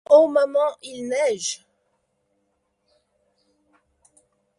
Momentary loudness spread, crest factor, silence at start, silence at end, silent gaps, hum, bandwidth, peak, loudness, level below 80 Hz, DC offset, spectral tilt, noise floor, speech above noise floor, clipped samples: 16 LU; 22 dB; 0.1 s; 3 s; none; none; 11.5 kHz; -2 dBFS; -21 LUFS; -74 dBFS; under 0.1%; -2 dB/octave; -72 dBFS; 51 dB; under 0.1%